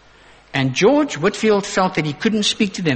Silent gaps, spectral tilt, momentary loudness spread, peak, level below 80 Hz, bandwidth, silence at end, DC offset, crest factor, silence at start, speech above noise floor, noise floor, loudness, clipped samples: none; -4.5 dB/octave; 5 LU; -4 dBFS; -52 dBFS; 8.8 kHz; 0 s; under 0.1%; 16 dB; 0.55 s; 30 dB; -48 dBFS; -18 LUFS; under 0.1%